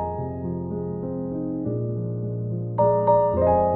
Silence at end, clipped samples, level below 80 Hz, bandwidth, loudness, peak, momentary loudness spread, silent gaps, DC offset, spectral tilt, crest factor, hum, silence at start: 0 s; under 0.1%; -46 dBFS; 4 kHz; -24 LUFS; -8 dBFS; 10 LU; none; under 0.1%; -14 dB/octave; 16 dB; none; 0 s